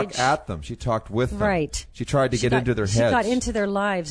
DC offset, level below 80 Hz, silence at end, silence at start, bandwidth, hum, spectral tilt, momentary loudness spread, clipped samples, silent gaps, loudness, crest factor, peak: under 0.1%; -40 dBFS; 0 s; 0 s; 11 kHz; none; -5 dB/octave; 7 LU; under 0.1%; none; -23 LUFS; 16 dB; -6 dBFS